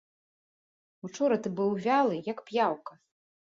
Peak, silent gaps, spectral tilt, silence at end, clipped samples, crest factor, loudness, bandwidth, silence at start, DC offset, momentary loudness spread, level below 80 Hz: -14 dBFS; none; -6 dB/octave; 0.6 s; under 0.1%; 18 dB; -29 LUFS; 7.8 kHz; 1.05 s; under 0.1%; 17 LU; -78 dBFS